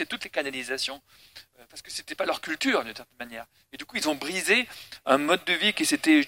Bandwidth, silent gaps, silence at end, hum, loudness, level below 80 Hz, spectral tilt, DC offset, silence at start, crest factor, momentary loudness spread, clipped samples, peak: 16.5 kHz; none; 0 s; none; -26 LUFS; -68 dBFS; -2 dB/octave; under 0.1%; 0 s; 22 dB; 19 LU; under 0.1%; -6 dBFS